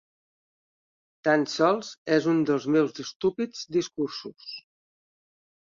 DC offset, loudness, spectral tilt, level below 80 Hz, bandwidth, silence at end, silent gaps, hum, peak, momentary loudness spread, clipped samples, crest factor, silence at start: under 0.1%; -26 LUFS; -5 dB/octave; -72 dBFS; 7.6 kHz; 1.15 s; 1.98-2.05 s, 3.16-3.20 s; none; -8 dBFS; 15 LU; under 0.1%; 20 dB; 1.25 s